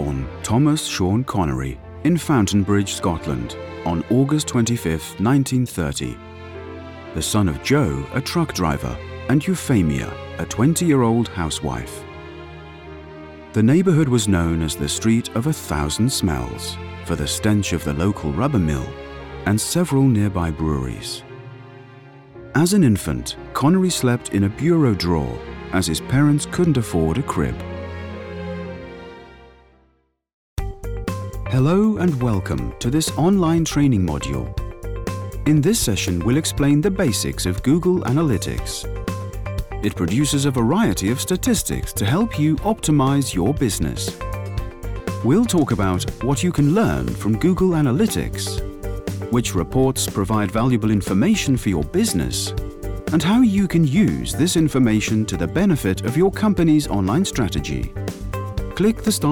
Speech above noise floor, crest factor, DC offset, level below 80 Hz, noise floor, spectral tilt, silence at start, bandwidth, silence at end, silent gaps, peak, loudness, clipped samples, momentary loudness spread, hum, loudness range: 44 dB; 14 dB; under 0.1%; -34 dBFS; -63 dBFS; -5.5 dB/octave; 0 s; 19.5 kHz; 0 s; 30.34-30.57 s; -6 dBFS; -20 LUFS; under 0.1%; 13 LU; none; 4 LU